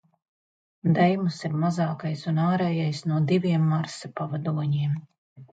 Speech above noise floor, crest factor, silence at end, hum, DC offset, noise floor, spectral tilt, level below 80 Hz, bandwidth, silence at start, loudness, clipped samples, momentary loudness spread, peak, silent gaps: over 66 dB; 18 dB; 0.1 s; none; under 0.1%; under -90 dBFS; -7.5 dB/octave; -68 dBFS; 9 kHz; 0.85 s; -25 LUFS; under 0.1%; 9 LU; -8 dBFS; 5.18-5.36 s